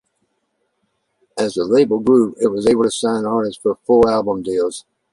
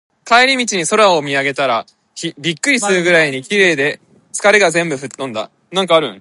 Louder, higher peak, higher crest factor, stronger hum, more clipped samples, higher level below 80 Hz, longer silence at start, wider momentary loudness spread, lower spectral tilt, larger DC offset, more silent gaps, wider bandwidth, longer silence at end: second, -17 LUFS vs -14 LUFS; about the same, -2 dBFS vs 0 dBFS; about the same, 16 dB vs 14 dB; neither; neither; first, -50 dBFS vs -66 dBFS; first, 1.35 s vs 0.25 s; second, 9 LU vs 13 LU; first, -5.5 dB/octave vs -3 dB/octave; neither; neither; about the same, 11.5 kHz vs 11.5 kHz; first, 0.35 s vs 0 s